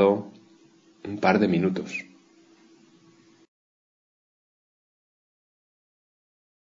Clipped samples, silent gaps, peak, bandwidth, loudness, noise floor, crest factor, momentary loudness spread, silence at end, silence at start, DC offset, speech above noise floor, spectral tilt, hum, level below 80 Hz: under 0.1%; none; -6 dBFS; 7.6 kHz; -25 LUFS; -57 dBFS; 24 dB; 18 LU; 4.6 s; 0 s; under 0.1%; 34 dB; -7 dB/octave; none; -72 dBFS